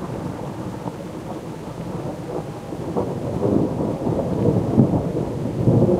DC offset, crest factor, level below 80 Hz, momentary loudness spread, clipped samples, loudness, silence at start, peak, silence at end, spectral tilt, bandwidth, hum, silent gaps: under 0.1%; 20 dB; -42 dBFS; 13 LU; under 0.1%; -23 LUFS; 0 s; -2 dBFS; 0 s; -9 dB/octave; 15 kHz; none; none